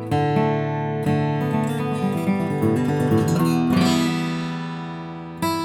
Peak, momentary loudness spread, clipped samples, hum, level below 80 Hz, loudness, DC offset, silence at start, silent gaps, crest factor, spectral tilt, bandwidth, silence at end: -8 dBFS; 10 LU; under 0.1%; none; -54 dBFS; -22 LUFS; under 0.1%; 0 s; none; 14 dB; -6.5 dB/octave; 17.5 kHz; 0 s